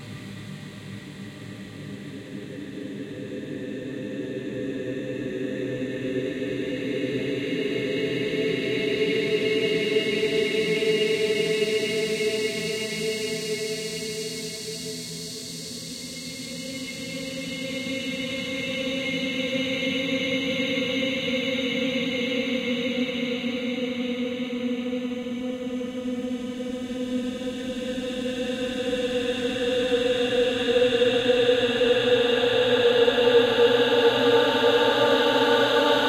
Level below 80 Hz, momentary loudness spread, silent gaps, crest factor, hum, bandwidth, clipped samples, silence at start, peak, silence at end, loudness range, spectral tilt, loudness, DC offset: -58 dBFS; 14 LU; none; 18 dB; none; 16 kHz; under 0.1%; 0 s; -8 dBFS; 0 s; 12 LU; -4 dB/octave; -25 LUFS; under 0.1%